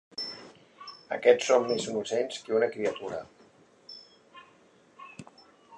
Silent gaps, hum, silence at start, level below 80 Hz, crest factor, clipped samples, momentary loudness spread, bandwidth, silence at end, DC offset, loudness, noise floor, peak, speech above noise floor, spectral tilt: none; none; 0.2 s; -74 dBFS; 24 dB; under 0.1%; 24 LU; 10.5 kHz; 0 s; under 0.1%; -28 LUFS; -60 dBFS; -8 dBFS; 33 dB; -3.5 dB/octave